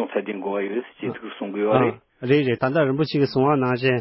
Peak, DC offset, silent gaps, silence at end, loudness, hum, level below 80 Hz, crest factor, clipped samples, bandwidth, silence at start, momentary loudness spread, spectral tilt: -2 dBFS; under 0.1%; none; 0 s; -22 LUFS; none; -62 dBFS; 20 dB; under 0.1%; 5.8 kHz; 0 s; 11 LU; -11 dB/octave